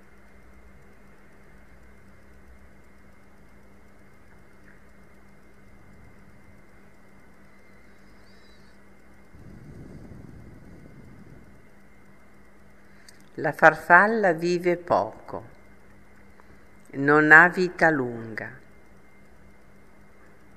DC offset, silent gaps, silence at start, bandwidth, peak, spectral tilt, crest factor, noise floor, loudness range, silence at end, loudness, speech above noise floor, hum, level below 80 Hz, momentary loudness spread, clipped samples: 0.3%; none; 9.7 s; 14 kHz; 0 dBFS; -6 dB/octave; 28 dB; -55 dBFS; 6 LU; 2.05 s; -20 LUFS; 34 dB; none; -58 dBFS; 31 LU; under 0.1%